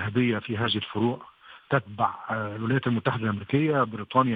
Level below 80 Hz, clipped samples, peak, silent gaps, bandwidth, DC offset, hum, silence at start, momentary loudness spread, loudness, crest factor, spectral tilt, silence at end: -64 dBFS; under 0.1%; -6 dBFS; none; 5 kHz; under 0.1%; none; 0 s; 5 LU; -27 LUFS; 20 dB; -9.5 dB/octave; 0 s